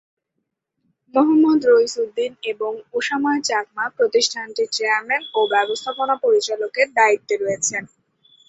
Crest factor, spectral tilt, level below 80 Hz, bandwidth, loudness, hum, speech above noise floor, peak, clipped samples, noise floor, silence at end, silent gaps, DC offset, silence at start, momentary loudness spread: 18 dB; -2 dB/octave; -70 dBFS; 8.2 kHz; -19 LUFS; none; 58 dB; -2 dBFS; under 0.1%; -77 dBFS; 0.65 s; none; under 0.1%; 1.15 s; 10 LU